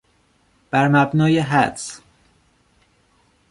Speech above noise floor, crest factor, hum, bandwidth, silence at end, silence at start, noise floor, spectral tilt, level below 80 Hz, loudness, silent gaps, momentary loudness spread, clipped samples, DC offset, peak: 43 dB; 18 dB; none; 11.5 kHz; 1.55 s; 0.75 s; -61 dBFS; -6 dB/octave; -56 dBFS; -18 LUFS; none; 16 LU; under 0.1%; under 0.1%; -2 dBFS